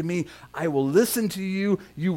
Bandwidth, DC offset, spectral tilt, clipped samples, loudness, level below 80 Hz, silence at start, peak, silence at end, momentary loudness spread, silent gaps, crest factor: 18 kHz; under 0.1%; -5.5 dB/octave; under 0.1%; -25 LUFS; -60 dBFS; 0 s; -8 dBFS; 0 s; 9 LU; none; 16 dB